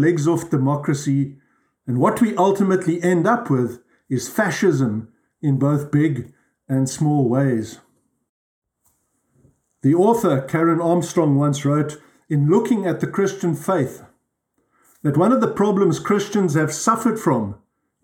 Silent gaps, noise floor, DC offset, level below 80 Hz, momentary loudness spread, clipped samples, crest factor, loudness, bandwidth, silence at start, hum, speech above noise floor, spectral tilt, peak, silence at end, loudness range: 8.29-8.62 s; -70 dBFS; under 0.1%; -62 dBFS; 8 LU; under 0.1%; 16 dB; -19 LUFS; 17 kHz; 0 s; none; 52 dB; -7 dB/octave; -4 dBFS; 0.5 s; 3 LU